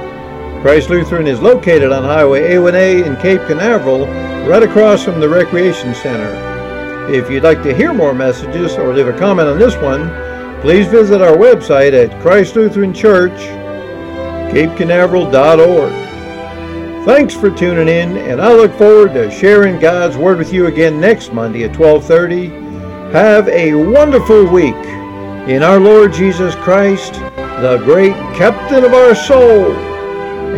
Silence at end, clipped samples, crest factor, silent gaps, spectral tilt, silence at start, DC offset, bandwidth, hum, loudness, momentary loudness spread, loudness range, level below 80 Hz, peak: 0 s; 1%; 10 dB; none; -6.5 dB/octave; 0 s; under 0.1%; 11 kHz; none; -9 LUFS; 16 LU; 3 LU; -34 dBFS; 0 dBFS